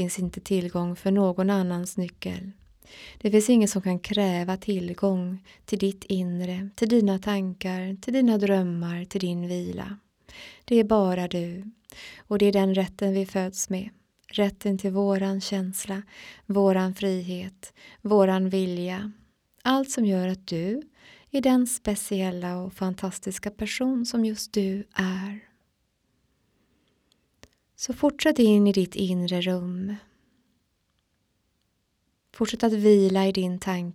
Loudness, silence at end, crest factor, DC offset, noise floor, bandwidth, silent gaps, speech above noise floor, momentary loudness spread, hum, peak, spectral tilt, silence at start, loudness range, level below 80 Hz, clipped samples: -25 LUFS; 0 s; 18 dB; under 0.1%; -73 dBFS; 15.5 kHz; none; 48 dB; 14 LU; none; -8 dBFS; -5.5 dB/octave; 0 s; 5 LU; -58 dBFS; under 0.1%